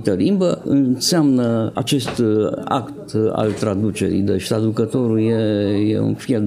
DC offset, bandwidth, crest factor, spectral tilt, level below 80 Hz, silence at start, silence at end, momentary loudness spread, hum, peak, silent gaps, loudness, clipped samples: under 0.1%; 16 kHz; 16 dB; -6 dB/octave; -56 dBFS; 0 s; 0 s; 4 LU; none; -2 dBFS; none; -18 LUFS; under 0.1%